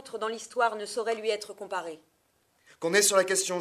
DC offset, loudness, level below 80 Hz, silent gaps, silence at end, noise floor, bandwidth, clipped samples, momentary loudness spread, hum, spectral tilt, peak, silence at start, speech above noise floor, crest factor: under 0.1%; -28 LUFS; -80 dBFS; none; 0 s; -70 dBFS; 15 kHz; under 0.1%; 14 LU; none; -1.5 dB/octave; -8 dBFS; 0 s; 42 dB; 22 dB